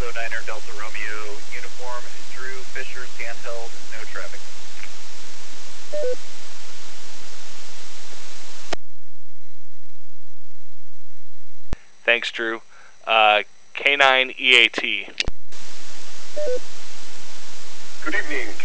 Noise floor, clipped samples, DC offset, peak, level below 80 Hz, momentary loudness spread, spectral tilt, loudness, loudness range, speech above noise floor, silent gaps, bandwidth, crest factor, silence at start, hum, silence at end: -57 dBFS; under 0.1%; 20%; 0 dBFS; -50 dBFS; 24 LU; -2.5 dB/octave; -22 LUFS; 22 LU; 40 dB; none; 8 kHz; 20 dB; 0 s; none; 0 s